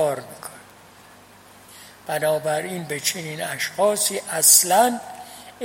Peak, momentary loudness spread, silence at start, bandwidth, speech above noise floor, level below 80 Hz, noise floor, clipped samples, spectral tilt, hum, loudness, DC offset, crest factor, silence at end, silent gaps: 0 dBFS; 25 LU; 0 s; 16.5 kHz; 27 dB; -68 dBFS; -48 dBFS; under 0.1%; -1.5 dB/octave; none; -19 LUFS; under 0.1%; 22 dB; 0 s; none